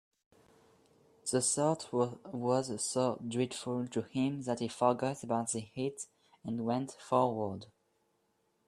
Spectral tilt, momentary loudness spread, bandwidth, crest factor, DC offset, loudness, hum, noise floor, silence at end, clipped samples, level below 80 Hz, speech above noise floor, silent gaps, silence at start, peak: -5 dB/octave; 9 LU; 13 kHz; 22 dB; under 0.1%; -34 LUFS; none; -76 dBFS; 1.05 s; under 0.1%; -74 dBFS; 43 dB; none; 1.25 s; -14 dBFS